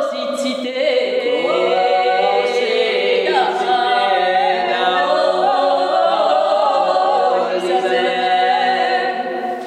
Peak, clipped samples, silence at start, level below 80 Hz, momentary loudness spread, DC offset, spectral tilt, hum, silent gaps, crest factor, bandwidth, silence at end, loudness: -2 dBFS; under 0.1%; 0 s; -72 dBFS; 3 LU; under 0.1%; -3 dB/octave; none; none; 14 dB; 11 kHz; 0 s; -16 LUFS